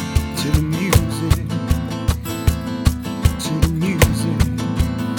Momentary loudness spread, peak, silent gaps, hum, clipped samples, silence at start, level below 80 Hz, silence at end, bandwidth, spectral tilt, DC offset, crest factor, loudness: 5 LU; 0 dBFS; none; none; under 0.1%; 0 s; -24 dBFS; 0 s; over 20 kHz; -5.5 dB/octave; under 0.1%; 18 dB; -19 LUFS